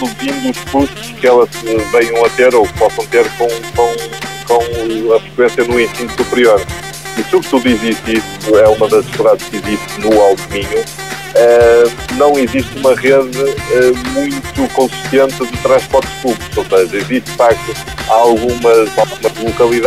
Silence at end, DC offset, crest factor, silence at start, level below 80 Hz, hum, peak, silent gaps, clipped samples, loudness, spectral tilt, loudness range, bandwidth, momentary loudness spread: 0 s; 0.7%; 12 dB; 0 s; -36 dBFS; none; 0 dBFS; none; under 0.1%; -12 LUFS; -4.5 dB/octave; 2 LU; 15.5 kHz; 9 LU